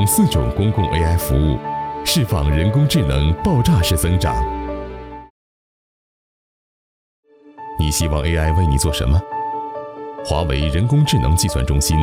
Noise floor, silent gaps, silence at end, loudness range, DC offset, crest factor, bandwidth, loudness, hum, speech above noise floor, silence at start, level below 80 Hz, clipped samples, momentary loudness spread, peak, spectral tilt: under -90 dBFS; 5.30-7.23 s; 0 s; 10 LU; under 0.1%; 14 dB; 19 kHz; -18 LUFS; none; over 74 dB; 0 s; -26 dBFS; under 0.1%; 14 LU; -4 dBFS; -5.5 dB/octave